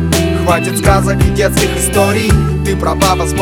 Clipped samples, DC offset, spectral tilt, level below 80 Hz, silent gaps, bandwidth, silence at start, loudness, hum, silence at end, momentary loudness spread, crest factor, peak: under 0.1%; under 0.1%; -5 dB/octave; -20 dBFS; none; 19 kHz; 0 s; -12 LUFS; none; 0 s; 2 LU; 12 dB; 0 dBFS